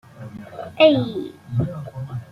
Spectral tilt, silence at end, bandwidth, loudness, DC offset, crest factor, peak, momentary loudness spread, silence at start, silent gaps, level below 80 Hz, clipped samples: -8 dB/octave; 0 s; 6.6 kHz; -20 LUFS; under 0.1%; 20 dB; -2 dBFS; 21 LU; 0.15 s; none; -52 dBFS; under 0.1%